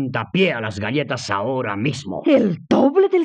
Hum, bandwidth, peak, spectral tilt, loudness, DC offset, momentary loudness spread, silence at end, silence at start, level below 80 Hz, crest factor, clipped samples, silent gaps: none; 9.4 kHz; -4 dBFS; -6 dB/octave; -19 LUFS; under 0.1%; 8 LU; 0 s; 0 s; -64 dBFS; 16 dB; under 0.1%; none